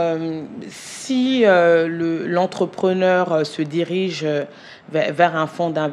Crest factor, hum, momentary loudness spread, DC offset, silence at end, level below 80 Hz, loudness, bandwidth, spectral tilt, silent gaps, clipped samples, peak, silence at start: 18 dB; none; 15 LU; under 0.1%; 0 s; -70 dBFS; -19 LUFS; 12 kHz; -5.5 dB/octave; none; under 0.1%; 0 dBFS; 0 s